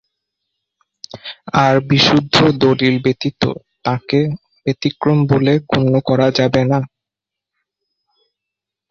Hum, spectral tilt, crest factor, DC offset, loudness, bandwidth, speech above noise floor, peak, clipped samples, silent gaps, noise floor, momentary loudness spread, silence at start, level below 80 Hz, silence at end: none; -6.5 dB/octave; 16 dB; under 0.1%; -15 LUFS; 7.6 kHz; 70 dB; 0 dBFS; under 0.1%; none; -84 dBFS; 12 LU; 1.15 s; -48 dBFS; 2.05 s